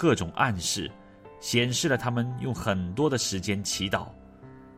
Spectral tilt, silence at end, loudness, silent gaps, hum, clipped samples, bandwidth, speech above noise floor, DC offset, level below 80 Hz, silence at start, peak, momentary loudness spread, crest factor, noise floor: -4 dB/octave; 0 s; -27 LUFS; none; none; under 0.1%; 16 kHz; 21 dB; under 0.1%; -54 dBFS; 0 s; -8 dBFS; 7 LU; 22 dB; -48 dBFS